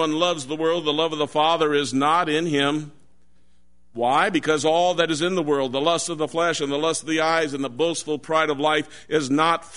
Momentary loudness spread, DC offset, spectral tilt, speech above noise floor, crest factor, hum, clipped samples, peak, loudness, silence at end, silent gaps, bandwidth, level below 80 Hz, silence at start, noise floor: 5 LU; 0.4%; -3.5 dB/octave; 42 dB; 18 dB; none; under 0.1%; -4 dBFS; -22 LUFS; 0 s; none; 11 kHz; -62 dBFS; 0 s; -63 dBFS